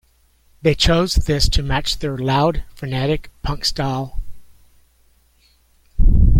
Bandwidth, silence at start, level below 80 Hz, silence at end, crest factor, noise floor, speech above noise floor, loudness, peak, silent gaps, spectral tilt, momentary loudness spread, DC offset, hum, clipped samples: 15.5 kHz; 0.65 s; -22 dBFS; 0 s; 16 dB; -56 dBFS; 38 dB; -19 LUFS; -2 dBFS; none; -5 dB/octave; 12 LU; under 0.1%; none; under 0.1%